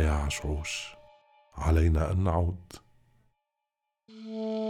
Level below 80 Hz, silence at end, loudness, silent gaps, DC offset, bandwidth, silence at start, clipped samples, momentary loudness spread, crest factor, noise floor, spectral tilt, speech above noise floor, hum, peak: -38 dBFS; 0 s; -29 LUFS; none; under 0.1%; 12.5 kHz; 0 s; under 0.1%; 22 LU; 16 dB; -86 dBFS; -6 dB/octave; 58 dB; none; -14 dBFS